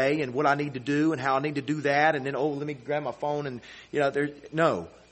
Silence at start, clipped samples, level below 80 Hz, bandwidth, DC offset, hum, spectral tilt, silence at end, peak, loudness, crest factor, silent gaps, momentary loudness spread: 0 s; under 0.1%; -66 dBFS; 8.4 kHz; under 0.1%; none; -6.5 dB/octave; 0.2 s; -8 dBFS; -27 LUFS; 20 dB; none; 9 LU